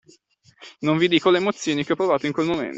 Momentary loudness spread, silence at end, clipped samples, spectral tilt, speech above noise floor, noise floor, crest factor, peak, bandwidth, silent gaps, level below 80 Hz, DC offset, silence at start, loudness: 6 LU; 0 s; under 0.1%; -5 dB/octave; 37 dB; -57 dBFS; 18 dB; -4 dBFS; 8 kHz; none; -64 dBFS; under 0.1%; 0.6 s; -21 LUFS